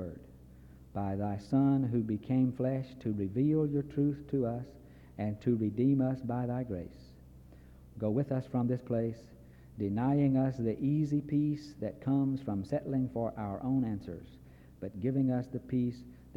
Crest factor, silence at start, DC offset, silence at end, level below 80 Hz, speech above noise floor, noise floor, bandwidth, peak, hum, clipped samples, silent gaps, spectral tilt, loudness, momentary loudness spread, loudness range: 16 dB; 0 s; under 0.1%; 0.05 s; -58 dBFS; 22 dB; -54 dBFS; 7.2 kHz; -18 dBFS; none; under 0.1%; none; -10 dB/octave; -33 LUFS; 13 LU; 4 LU